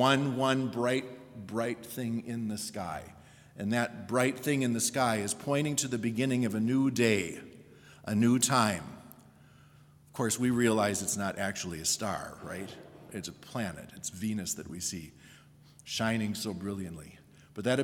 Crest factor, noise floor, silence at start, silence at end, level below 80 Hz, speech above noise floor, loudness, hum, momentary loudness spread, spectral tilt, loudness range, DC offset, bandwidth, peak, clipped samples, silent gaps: 22 dB; -58 dBFS; 0 s; 0 s; -68 dBFS; 27 dB; -31 LUFS; none; 18 LU; -4 dB/octave; 7 LU; under 0.1%; 18 kHz; -10 dBFS; under 0.1%; none